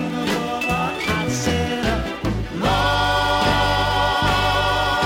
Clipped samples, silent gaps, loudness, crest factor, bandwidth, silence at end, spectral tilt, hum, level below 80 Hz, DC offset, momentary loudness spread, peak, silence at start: under 0.1%; none; -20 LUFS; 14 dB; 16.5 kHz; 0 s; -4.5 dB/octave; none; -32 dBFS; under 0.1%; 5 LU; -6 dBFS; 0 s